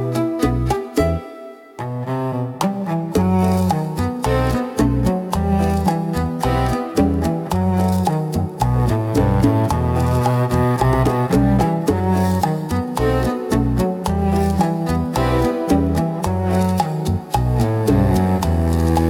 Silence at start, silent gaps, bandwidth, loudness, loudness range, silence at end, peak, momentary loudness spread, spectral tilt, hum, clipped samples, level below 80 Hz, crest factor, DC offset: 0 s; none; 18 kHz; -19 LUFS; 3 LU; 0 s; -4 dBFS; 5 LU; -7.5 dB/octave; none; under 0.1%; -30 dBFS; 14 dB; under 0.1%